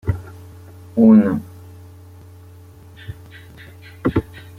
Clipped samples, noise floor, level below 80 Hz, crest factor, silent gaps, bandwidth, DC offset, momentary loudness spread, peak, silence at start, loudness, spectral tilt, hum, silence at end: under 0.1%; -42 dBFS; -44 dBFS; 20 dB; none; 4.5 kHz; under 0.1%; 29 LU; -2 dBFS; 0.05 s; -17 LUFS; -9.5 dB/octave; none; 0.2 s